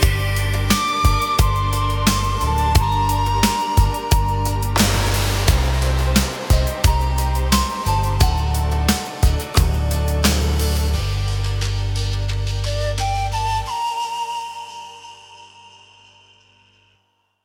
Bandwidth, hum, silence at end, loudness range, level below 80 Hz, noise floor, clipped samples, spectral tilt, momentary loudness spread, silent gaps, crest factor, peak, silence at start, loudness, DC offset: 19 kHz; none; 1.75 s; 7 LU; -22 dBFS; -65 dBFS; under 0.1%; -4.5 dB/octave; 6 LU; none; 18 dB; -2 dBFS; 0 s; -19 LUFS; under 0.1%